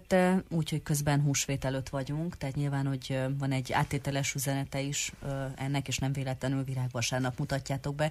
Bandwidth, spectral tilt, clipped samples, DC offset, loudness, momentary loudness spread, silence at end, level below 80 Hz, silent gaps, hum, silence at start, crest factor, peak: 15 kHz; -5 dB/octave; under 0.1%; under 0.1%; -32 LUFS; 7 LU; 0 s; -52 dBFS; none; none; 0 s; 18 dB; -12 dBFS